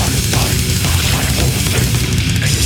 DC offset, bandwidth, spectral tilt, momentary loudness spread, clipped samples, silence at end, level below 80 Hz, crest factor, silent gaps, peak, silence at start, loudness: under 0.1%; 19.5 kHz; -3.5 dB/octave; 1 LU; under 0.1%; 0 s; -22 dBFS; 14 dB; none; 0 dBFS; 0 s; -14 LUFS